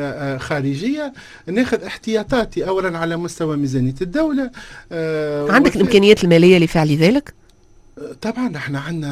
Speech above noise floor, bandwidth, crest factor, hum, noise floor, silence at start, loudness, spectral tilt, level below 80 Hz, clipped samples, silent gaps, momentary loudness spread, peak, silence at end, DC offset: 31 dB; 14.5 kHz; 18 dB; none; -48 dBFS; 0 s; -17 LUFS; -6 dB/octave; -42 dBFS; under 0.1%; none; 14 LU; 0 dBFS; 0 s; under 0.1%